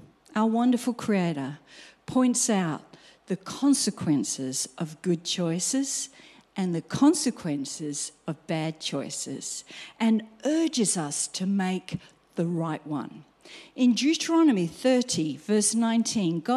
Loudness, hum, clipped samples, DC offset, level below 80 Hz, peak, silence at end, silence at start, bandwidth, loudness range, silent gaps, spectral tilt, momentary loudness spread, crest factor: -26 LUFS; none; under 0.1%; under 0.1%; -68 dBFS; -10 dBFS; 0 s; 0.35 s; 14 kHz; 4 LU; none; -4 dB/octave; 12 LU; 16 dB